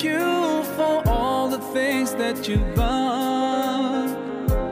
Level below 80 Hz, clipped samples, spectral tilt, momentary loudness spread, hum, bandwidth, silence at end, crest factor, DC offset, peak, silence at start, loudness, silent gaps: -32 dBFS; under 0.1%; -5.5 dB/octave; 4 LU; none; 16 kHz; 0 s; 14 dB; under 0.1%; -8 dBFS; 0 s; -23 LUFS; none